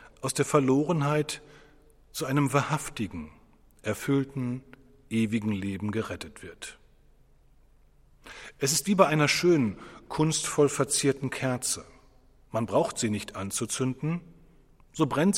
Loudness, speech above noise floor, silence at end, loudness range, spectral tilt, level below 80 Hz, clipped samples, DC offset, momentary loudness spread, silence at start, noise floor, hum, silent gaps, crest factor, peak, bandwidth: -27 LUFS; 31 dB; 0 s; 9 LU; -4.5 dB/octave; -58 dBFS; under 0.1%; under 0.1%; 17 LU; 0.05 s; -59 dBFS; none; none; 24 dB; -4 dBFS; 16 kHz